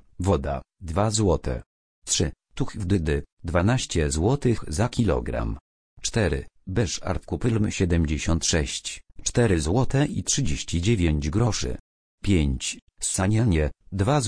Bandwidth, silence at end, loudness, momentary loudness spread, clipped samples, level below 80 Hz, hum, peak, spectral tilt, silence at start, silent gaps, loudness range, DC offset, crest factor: 10.5 kHz; 0 s; -25 LUFS; 10 LU; under 0.1%; -34 dBFS; none; -8 dBFS; -5 dB/octave; 0.2 s; 1.66-2.02 s, 3.32-3.37 s, 5.61-5.97 s, 11.80-12.18 s, 12.82-12.87 s; 2 LU; under 0.1%; 18 dB